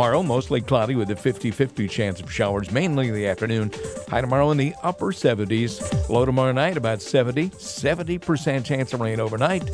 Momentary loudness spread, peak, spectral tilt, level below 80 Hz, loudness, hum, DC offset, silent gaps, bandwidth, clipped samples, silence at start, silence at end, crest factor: 6 LU; -4 dBFS; -6 dB/octave; -44 dBFS; -23 LUFS; none; under 0.1%; none; 11 kHz; under 0.1%; 0 s; 0 s; 18 dB